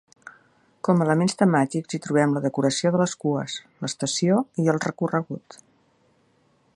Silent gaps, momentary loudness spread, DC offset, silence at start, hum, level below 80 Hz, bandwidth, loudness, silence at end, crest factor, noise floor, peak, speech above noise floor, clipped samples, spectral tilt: none; 11 LU; under 0.1%; 0.25 s; none; -68 dBFS; 11.5 kHz; -23 LUFS; 1.2 s; 20 dB; -63 dBFS; -4 dBFS; 41 dB; under 0.1%; -5.5 dB/octave